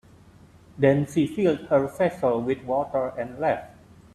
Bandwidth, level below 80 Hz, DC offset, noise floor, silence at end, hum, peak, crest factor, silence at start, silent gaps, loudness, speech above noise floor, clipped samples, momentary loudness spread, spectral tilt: 13 kHz; -58 dBFS; under 0.1%; -52 dBFS; 0.45 s; none; -6 dBFS; 20 dB; 0.75 s; none; -24 LUFS; 28 dB; under 0.1%; 6 LU; -7.5 dB/octave